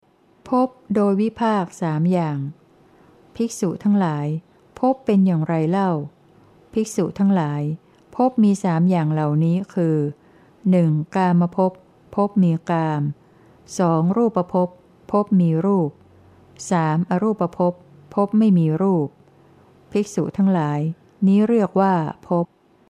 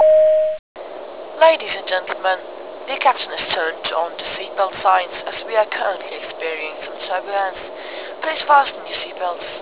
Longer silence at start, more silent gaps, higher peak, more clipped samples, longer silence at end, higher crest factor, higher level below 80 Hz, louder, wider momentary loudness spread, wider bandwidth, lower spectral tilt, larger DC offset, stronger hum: first, 0.45 s vs 0 s; second, none vs 0.59-0.75 s; second, -6 dBFS vs 0 dBFS; neither; first, 0.45 s vs 0 s; about the same, 16 dB vs 20 dB; about the same, -62 dBFS vs -60 dBFS; about the same, -20 LUFS vs -20 LUFS; second, 10 LU vs 16 LU; first, 11 kHz vs 4 kHz; first, -8 dB/octave vs -5.5 dB/octave; second, under 0.1% vs 0.4%; neither